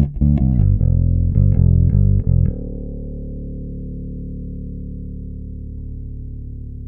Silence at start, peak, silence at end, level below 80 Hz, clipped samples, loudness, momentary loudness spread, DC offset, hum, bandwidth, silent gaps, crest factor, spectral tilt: 0 s; -2 dBFS; 0 s; -22 dBFS; under 0.1%; -17 LUFS; 17 LU; under 0.1%; none; 1.7 kHz; none; 16 dB; -14.5 dB/octave